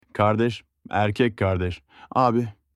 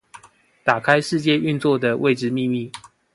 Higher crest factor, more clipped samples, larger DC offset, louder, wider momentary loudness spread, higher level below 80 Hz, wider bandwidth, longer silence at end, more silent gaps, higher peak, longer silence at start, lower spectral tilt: about the same, 18 dB vs 20 dB; neither; neither; second, -23 LUFS vs -20 LUFS; about the same, 9 LU vs 9 LU; first, -50 dBFS vs -64 dBFS; about the same, 11.5 kHz vs 11.5 kHz; about the same, 0.25 s vs 0.35 s; neither; second, -6 dBFS vs 0 dBFS; about the same, 0.15 s vs 0.15 s; first, -7.5 dB/octave vs -6 dB/octave